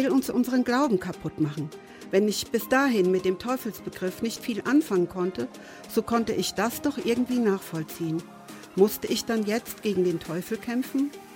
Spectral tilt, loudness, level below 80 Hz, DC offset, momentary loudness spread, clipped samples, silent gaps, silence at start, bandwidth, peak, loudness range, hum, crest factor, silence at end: -5 dB/octave; -27 LUFS; -60 dBFS; under 0.1%; 11 LU; under 0.1%; none; 0 s; 17 kHz; -8 dBFS; 2 LU; none; 18 dB; 0 s